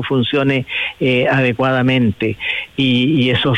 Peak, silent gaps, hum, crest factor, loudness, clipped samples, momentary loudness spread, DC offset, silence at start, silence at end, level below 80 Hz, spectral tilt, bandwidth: -4 dBFS; none; none; 10 dB; -15 LUFS; under 0.1%; 6 LU; under 0.1%; 0 s; 0 s; -50 dBFS; -7.5 dB/octave; 8.6 kHz